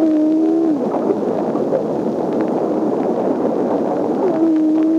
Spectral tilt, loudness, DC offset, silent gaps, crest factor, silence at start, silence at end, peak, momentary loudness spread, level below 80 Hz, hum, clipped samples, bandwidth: -8.5 dB/octave; -17 LUFS; under 0.1%; none; 12 dB; 0 s; 0 s; -4 dBFS; 4 LU; -62 dBFS; none; under 0.1%; 7.2 kHz